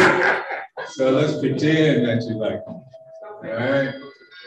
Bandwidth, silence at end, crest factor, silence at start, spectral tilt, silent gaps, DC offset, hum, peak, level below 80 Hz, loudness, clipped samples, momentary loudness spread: 11.5 kHz; 0 s; 18 dB; 0 s; -6 dB/octave; none; under 0.1%; none; -4 dBFS; -58 dBFS; -21 LUFS; under 0.1%; 21 LU